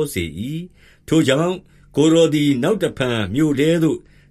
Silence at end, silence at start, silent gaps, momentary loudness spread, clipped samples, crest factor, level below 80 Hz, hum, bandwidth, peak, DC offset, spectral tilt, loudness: 0.35 s; 0 s; none; 13 LU; under 0.1%; 16 dB; -48 dBFS; none; 14.5 kHz; -2 dBFS; under 0.1%; -6 dB/octave; -18 LUFS